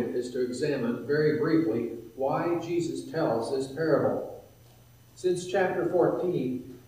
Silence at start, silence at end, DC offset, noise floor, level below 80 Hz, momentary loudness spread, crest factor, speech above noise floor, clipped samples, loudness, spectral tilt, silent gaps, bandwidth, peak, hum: 0 s; 0.1 s; under 0.1%; -55 dBFS; -66 dBFS; 7 LU; 16 dB; 27 dB; under 0.1%; -28 LUFS; -6.5 dB/octave; none; 15.5 kHz; -12 dBFS; none